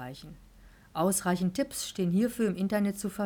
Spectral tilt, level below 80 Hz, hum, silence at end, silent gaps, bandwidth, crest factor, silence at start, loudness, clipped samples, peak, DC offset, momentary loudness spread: -5 dB/octave; -58 dBFS; none; 0 s; none; over 20 kHz; 14 dB; 0 s; -30 LUFS; under 0.1%; -16 dBFS; under 0.1%; 10 LU